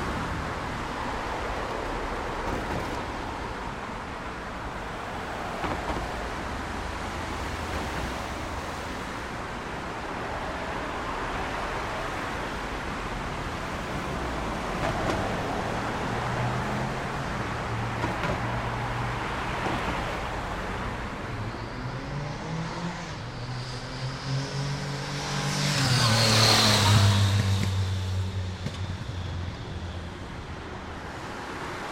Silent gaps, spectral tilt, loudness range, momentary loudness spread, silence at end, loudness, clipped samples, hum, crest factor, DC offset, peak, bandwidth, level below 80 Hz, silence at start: none; -4.5 dB/octave; 11 LU; 11 LU; 0 s; -29 LUFS; under 0.1%; none; 22 dB; under 0.1%; -8 dBFS; 16 kHz; -42 dBFS; 0 s